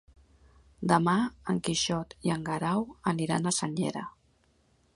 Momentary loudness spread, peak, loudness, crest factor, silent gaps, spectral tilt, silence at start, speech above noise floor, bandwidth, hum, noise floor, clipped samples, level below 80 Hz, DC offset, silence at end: 8 LU; -8 dBFS; -29 LUFS; 24 dB; none; -4.5 dB/octave; 0.8 s; 38 dB; 11.5 kHz; none; -67 dBFS; under 0.1%; -60 dBFS; under 0.1%; 0.85 s